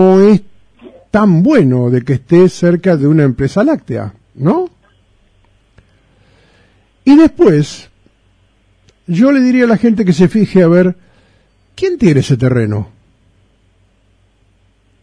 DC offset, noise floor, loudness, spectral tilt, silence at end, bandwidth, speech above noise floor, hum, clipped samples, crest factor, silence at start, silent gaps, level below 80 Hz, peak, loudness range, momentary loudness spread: under 0.1%; -53 dBFS; -11 LUFS; -8 dB/octave; 2.15 s; 10.5 kHz; 44 dB; none; under 0.1%; 12 dB; 0 s; none; -42 dBFS; 0 dBFS; 6 LU; 11 LU